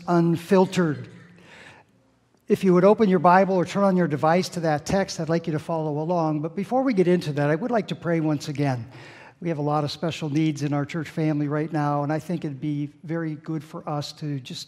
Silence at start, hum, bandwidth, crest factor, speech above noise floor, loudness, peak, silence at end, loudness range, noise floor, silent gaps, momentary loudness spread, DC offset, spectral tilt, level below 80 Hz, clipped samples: 0 s; none; 13.5 kHz; 20 dB; 39 dB; -24 LUFS; -2 dBFS; 0.05 s; 6 LU; -62 dBFS; none; 13 LU; under 0.1%; -7 dB/octave; -60 dBFS; under 0.1%